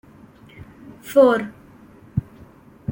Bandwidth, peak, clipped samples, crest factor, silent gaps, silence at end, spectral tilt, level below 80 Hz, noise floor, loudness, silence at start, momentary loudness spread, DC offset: 17 kHz; -4 dBFS; under 0.1%; 20 dB; none; 0 s; -7 dB/octave; -52 dBFS; -47 dBFS; -19 LUFS; 1.05 s; 26 LU; under 0.1%